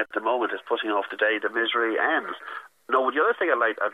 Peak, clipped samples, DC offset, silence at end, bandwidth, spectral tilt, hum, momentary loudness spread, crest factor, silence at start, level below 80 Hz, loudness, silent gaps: -8 dBFS; under 0.1%; under 0.1%; 0 s; 11.5 kHz; -4 dB/octave; none; 9 LU; 18 dB; 0 s; -84 dBFS; -24 LUFS; none